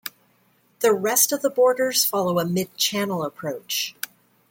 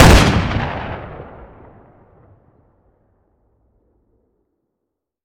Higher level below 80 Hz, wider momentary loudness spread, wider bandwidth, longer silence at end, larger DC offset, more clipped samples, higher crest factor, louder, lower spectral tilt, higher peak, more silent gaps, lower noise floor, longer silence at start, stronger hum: second, -70 dBFS vs -24 dBFS; second, 12 LU vs 27 LU; about the same, 17 kHz vs 17.5 kHz; second, 0.6 s vs 4 s; neither; neither; about the same, 20 dB vs 18 dB; second, -21 LUFS vs -16 LUFS; second, -3 dB/octave vs -5 dB/octave; second, -4 dBFS vs 0 dBFS; neither; second, -62 dBFS vs -78 dBFS; about the same, 0.05 s vs 0 s; neither